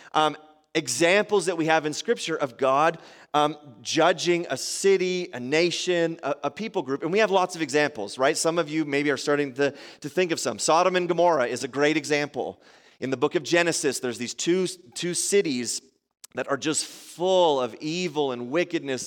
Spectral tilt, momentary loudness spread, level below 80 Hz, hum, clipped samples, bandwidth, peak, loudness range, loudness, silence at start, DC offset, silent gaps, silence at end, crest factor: -3.5 dB/octave; 9 LU; -76 dBFS; none; under 0.1%; 17 kHz; -6 dBFS; 2 LU; -24 LUFS; 0.05 s; under 0.1%; none; 0 s; 20 dB